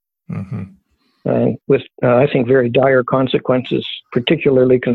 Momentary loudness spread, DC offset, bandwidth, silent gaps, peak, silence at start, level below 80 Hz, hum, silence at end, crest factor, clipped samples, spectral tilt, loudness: 15 LU; under 0.1%; 4.4 kHz; none; -2 dBFS; 0.3 s; -50 dBFS; none; 0 s; 14 dB; under 0.1%; -9.5 dB/octave; -15 LUFS